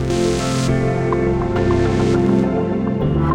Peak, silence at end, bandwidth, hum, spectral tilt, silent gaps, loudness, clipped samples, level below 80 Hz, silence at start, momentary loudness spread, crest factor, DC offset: -4 dBFS; 0 s; 12 kHz; none; -7 dB/octave; none; -18 LUFS; under 0.1%; -30 dBFS; 0 s; 3 LU; 12 dB; 1%